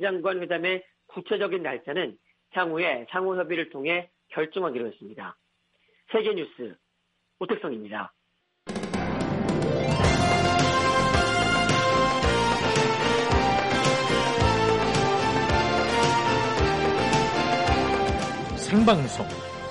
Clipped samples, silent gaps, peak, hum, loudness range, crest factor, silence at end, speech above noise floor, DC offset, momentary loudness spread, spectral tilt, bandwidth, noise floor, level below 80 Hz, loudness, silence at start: under 0.1%; none; -8 dBFS; none; 10 LU; 16 dB; 0 s; 46 dB; under 0.1%; 13 LU; -5 dB/octave; 11.5 kHz; -74 dBFS; -40 dBFS; -24 LUFS; 0 s